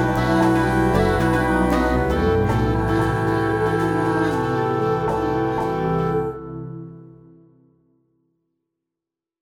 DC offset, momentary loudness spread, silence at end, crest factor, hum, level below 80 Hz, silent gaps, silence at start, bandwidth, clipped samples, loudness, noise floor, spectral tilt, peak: under 0.1%; 7 LU; 2.35 s; 16 dB; none; -34 dBFS; none; 0 s; 16 kHz; under 0.1%; -20 LUFS; -87 dBFS; -7.5 dB/octave; -4 dBFS